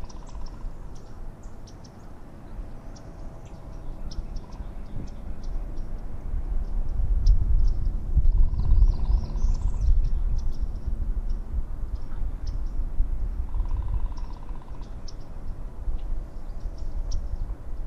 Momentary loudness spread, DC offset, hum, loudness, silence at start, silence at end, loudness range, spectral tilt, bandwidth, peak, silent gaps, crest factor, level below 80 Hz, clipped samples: 18 LU; under 0.1%; none; -32 LUFS; 0 s; 0 s; 15 LU; -7.5 dB/octave; 6.4 kHz; -8 dBFS; none; 18 dB; -26 dBFS; under 0.1%